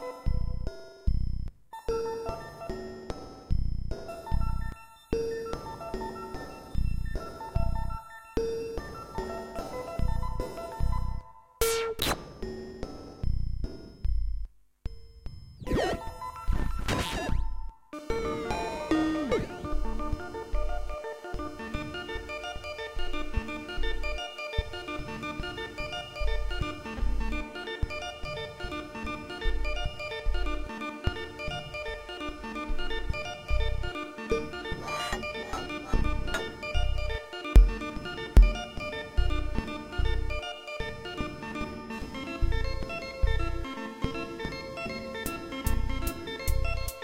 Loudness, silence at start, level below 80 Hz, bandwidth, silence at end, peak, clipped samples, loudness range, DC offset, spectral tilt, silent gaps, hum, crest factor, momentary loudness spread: -34 LUFS; 0 s; -32 dBFS; 16.5 kHz; 0 s; -6 dBFS; under 0.1%; 6 LU; under 0.1%; -5 dB/octave; none; none; 24 dB; 9 LU